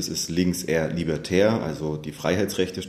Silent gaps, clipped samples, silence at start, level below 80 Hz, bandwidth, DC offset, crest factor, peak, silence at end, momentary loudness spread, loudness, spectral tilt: none; under 0.1%; 0 s; -50 dBFS; 14 kHz; under 0.1%; 18 dB; -6 dBFS; 0 s; 8 LU; -24 LUFS; -5 dB/octave